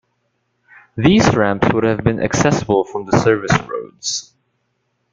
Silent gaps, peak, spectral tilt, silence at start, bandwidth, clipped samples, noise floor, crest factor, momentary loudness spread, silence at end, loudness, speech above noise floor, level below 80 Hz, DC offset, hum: none; -2 dBFS; -5.5 dB/octave; 0.95 s; 9.4 kHz; under 0.1%; -68 dBFS; 16 dB; 10 LU; 0.9 s; -16 LUFS; 53 dB; -42 dBFS; under 0.1%; none